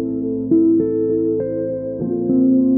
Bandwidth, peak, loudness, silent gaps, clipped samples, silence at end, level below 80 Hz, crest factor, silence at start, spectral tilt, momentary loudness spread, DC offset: 1.9 kHz; -6 dBFS; -18 LUFS; none; under 0.1%; 0 s; -50 dBFS; 12 dB; 0 s; -16 dB/octave; 8 LU; under 0.1%